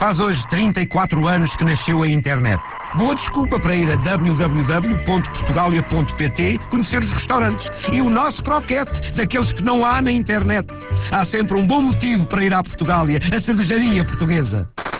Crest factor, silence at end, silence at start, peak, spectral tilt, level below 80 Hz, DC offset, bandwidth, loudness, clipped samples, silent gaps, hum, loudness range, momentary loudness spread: 12 dB; 0 s; 0 s; -6 dBFS; -11 dB/octave; -32 dBFS; under 0.1%; 4 kHz; -18 LUFS; under 0.1%; none; none; 1 LU; 4 LU